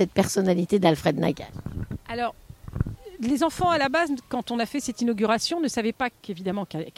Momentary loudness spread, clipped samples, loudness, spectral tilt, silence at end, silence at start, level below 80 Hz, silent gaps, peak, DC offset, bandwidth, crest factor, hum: 12 LU; under 0.1%; -25 LUFS; -5 dB/octave; 0.05 s; 0 s; -46 dBFS; none; -6 dBFS; under 0.1%; 16 kHz; 20 dB; none